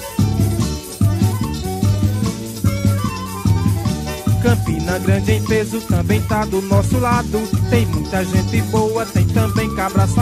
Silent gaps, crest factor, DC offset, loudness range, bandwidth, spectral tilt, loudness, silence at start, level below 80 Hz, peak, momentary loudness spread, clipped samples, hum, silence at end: none; 14 dB; under 0.1%; 2 LU; 15.5 kHz; -6.5 dB/octave; -18 LUFS; 0 s; -30 dBFS; -2 dBFS; 5 LU; under 0.1%; none; 0 s